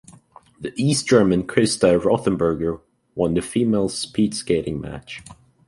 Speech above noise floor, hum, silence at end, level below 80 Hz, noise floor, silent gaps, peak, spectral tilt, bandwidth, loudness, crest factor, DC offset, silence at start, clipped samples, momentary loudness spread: 29 dB; none; 0.35 s; -46 dBFS; -49 dBFS; none; -2 dBFS; -5.5 dB/octave; 11.5 kHz; -20 LUFS; 18 dB; under 0.1%; 0.6 s; under 0.1%; 18 LU